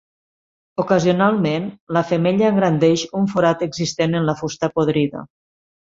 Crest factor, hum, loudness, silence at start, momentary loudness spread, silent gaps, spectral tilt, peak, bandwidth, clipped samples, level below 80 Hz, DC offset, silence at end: 18 dB; none; -19 LUFS; 0.8 s; 7 LU; 1.81-1.87 s; -6 dB/octave; -2 dBFS; 7.8 kHz; under 0.1%; -56 dBFS; under 0.1%; 0.7 s